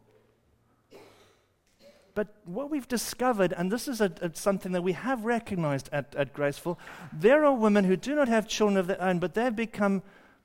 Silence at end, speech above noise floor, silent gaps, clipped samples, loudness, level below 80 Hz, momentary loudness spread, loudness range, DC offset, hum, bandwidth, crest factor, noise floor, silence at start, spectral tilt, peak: 0.35 s; 40 dB; none; under 0.1%; -28 LUFS; -60 dBFS; 12 LU; 7 LU; under 0.1%; none; 16 kHz; 18 dB; -67 dBFS; 0.95 s; -5.5 dB/octave; -10 dBFS